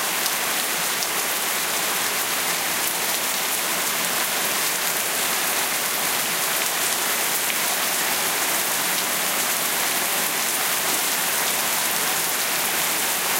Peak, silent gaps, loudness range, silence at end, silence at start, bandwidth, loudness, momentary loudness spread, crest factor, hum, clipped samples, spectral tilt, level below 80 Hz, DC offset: -4 dBFS; none; 1 LU; 0 s; 0 s; 17 kHz; -20 LUFS; 1 LU; 20 dB; none; under 0.1%; 0.5 dB/octave; -64 dBFS; under 0.1%